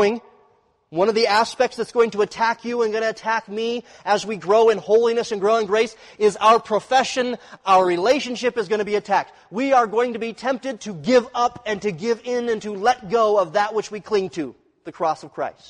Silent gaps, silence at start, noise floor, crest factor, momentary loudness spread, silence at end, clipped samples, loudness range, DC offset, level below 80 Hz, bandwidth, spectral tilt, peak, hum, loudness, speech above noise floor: none; 0 s; -60 dBFS; 14 dB; 10 LU; 0.2 s; under 0.1%; 3 LU; under 0.1%; -62 dBFS; 11 kHz; -4 dB/octave; -6 dBFS; none; -21 LUFS; 40 dB